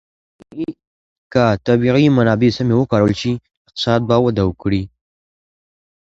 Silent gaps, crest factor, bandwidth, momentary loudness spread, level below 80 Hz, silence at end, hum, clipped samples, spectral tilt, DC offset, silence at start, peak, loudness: 0.87-1.30 s, 3.57-3.65 s; 18 dB; 7.8 kHz; 14 LU; -42 dBFS; 1.25 s; none; under 0.1%; -7.5 dB/octave; under 0.1%; 0.55 s; 0 dBFS; -16 LUFS